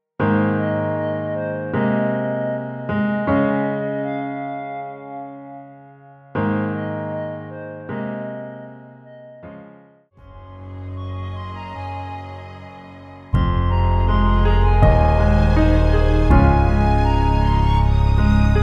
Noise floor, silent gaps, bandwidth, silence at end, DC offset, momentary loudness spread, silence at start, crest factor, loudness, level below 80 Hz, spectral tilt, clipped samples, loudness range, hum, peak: -48 dBFS; none; 6.6 kHz; 0 s; under 0.1%; 21 LU; 0.2 s; 18 dB; -19 LUFS; -22 dBFS; -9 dB/octave; under 0.1%; 17 LU; none; -2 dBFS